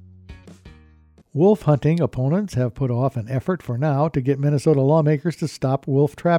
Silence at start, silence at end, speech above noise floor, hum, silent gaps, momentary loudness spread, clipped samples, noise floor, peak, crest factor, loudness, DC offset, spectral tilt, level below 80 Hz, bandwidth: 0.3 s; 0 s; 33 dB; none; none; 7 LU; under 0.1%; -52 dBFS; -6 dBFS; 14 dB; -20 LUFS; under 0.1%; -8.5 dB/octave; -50 dBFS; 11.5 kHz